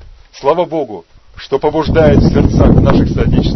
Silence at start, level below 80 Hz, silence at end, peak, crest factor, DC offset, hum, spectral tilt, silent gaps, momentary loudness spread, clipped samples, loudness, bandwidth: 0.1 s; -20 dBFS; 0 s; 0 dBFS; 12 dB; under 0.1%; none; -8.5 dB/octave; none; 11 LU; 0.3%; -11 LUFS; 6.2 kHz